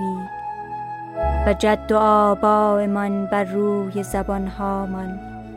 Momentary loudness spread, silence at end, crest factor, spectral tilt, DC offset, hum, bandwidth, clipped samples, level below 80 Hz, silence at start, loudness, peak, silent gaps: 14 LU; 0 s; 16 dB; -7 dB/octave; under 0.1%; none; 15 kHz; under 0.1%; -34 dBFS; 0 s; -21 LUFS; -4 dBFS; none